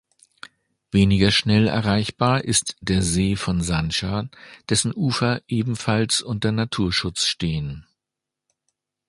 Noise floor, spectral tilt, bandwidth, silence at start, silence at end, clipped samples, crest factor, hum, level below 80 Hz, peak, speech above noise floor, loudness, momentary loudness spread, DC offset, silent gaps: -86 dBFS; -4.5 dB/octave; 11.5 kHz; 0.95 s; 1.25 s; under 0.1%; 20 dB; none; -40 dBFS; -2 dBFS; 64 dB; -21 LUFS; 8 LU; under 0.1%; none